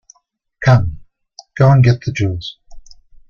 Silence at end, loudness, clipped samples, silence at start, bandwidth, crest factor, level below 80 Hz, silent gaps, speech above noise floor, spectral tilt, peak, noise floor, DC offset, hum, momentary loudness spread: 0.5 s; -14 LUFS; under 0.1%; 0.6 s; 7 kHz; 14 dB; -38 dBFS; none; 50 dB; -7.5 dB/octave; -2 dBFS; -63 dBFS; under 0.1%; none; 17 LU